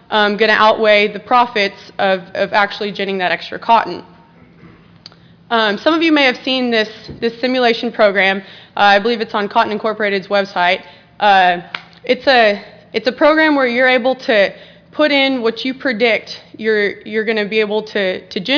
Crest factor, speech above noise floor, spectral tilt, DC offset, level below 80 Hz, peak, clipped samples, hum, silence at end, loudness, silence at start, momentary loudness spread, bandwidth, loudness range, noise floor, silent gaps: 14 dB; 30 dB; -5 dB/octave; under 0.1%; -58 dBFS; 0 dBFS; under 0.1%; none; 0 s; -14 LUFS; 0.1 s; 9 LU; 5.4 kHz; 4 LU; -44 dBFS; none